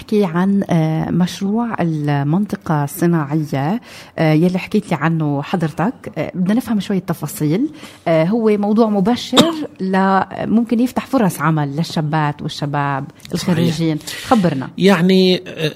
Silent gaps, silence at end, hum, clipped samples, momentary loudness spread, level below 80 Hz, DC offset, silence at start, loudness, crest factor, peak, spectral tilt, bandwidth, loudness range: none; 0 s; none; under 0.1%; 8 LU; -52 dBFS; under 0.1%; 0 s; -17 LUFS; 16 dB; 0 dBFS; -6.5 dB/octave; 16 kHz; 3 LU